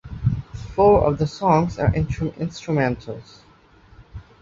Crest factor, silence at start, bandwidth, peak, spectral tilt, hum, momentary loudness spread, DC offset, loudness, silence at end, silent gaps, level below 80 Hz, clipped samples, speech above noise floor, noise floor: 18 dB; 0.05 s; 7.6 kHz; -4 dBFS; -8 dB/octave; none; 14 LU; under 0.1%; -21 LUFS; 0.2 s; none; -38 dBFS; under 0.1%; 32 dB; -52 dBFS